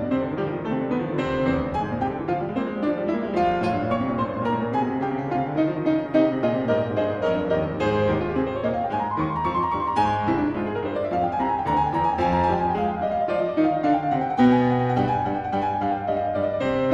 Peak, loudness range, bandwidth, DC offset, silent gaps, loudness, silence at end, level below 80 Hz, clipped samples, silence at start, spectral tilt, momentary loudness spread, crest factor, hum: -8 dBFS; 3 LU; 8 kHz; under 0.1%; none; -23 LUFS; 0 s; -46 dBFS; under 0.1%; 0 s; -8.5 dB/octave; 5 LU; 16 dB; none